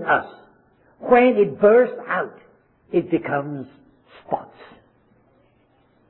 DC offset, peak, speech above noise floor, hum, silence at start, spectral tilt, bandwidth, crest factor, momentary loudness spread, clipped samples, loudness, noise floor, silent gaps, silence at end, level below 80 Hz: under 0.1%; -4 dBFS; 41 dB; none; 0 s; -10.5 dB/octave; 4.2 kHz; 18 dB; 19 LU; under 0.1%; -19 LUFS; -60 dBFS; none; 1.65 s; -60 dBFS